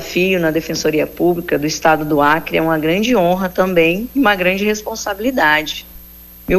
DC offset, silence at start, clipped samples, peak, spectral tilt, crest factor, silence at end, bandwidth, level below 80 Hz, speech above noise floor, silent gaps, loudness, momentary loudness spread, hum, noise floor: under 0.1%; 0 s; under 0.1%; 0 dBFS; -4.5 dB/octave; 14 dB; 0 s; 15.5 kHz; -40 dBFS; 23 dB; none; -15 LUFS; 6 LU; 60 Hz at -40 dBFS; -38 dBFS